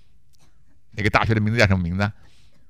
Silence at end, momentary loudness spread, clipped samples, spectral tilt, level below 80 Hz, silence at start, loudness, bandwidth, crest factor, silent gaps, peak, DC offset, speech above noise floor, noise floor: 0.6 s; 8 LU; under 0.1%; -6.5 dB/octave; -44 dBFS; 0.95 s; -21 LUFS; 12 kHz; 24 dB; none; 0 dBFS; 0.6%; 39 dB; -59 dBFS